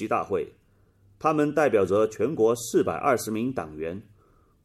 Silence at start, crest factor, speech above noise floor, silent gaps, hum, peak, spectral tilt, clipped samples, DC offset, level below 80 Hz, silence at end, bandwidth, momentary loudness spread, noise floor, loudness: 0 s; 18 dB; 36 dB; none; none; -8 dBFS; -5.5 dB/octave; under 0.1%; under 0.1%; -62 dBFS; 0.65 s; 14.5 kHz; 12 LU; -60 dBFS; -25 LUFS